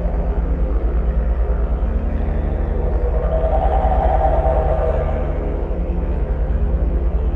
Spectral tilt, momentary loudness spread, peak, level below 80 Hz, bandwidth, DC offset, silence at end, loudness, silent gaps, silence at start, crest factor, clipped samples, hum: -10.5 dB/octave; 5 LU; -4 dBFS; -18 dBFS; 3.5 kHz; under 0.1%; 0 s; -20 LUFS; none; 0 s; 12 dB; under 0.1%; none